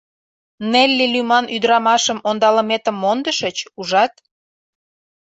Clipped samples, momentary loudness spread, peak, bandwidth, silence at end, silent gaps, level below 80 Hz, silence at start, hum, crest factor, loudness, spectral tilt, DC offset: under 0.1%; 7 LU; -2 dBFS; 8.2 kHz; 1.1 s; none; -64 dBFS; 0.6 s; none; 16 dB; -16 LUFS; -2.5 dB/octave; under 0.1%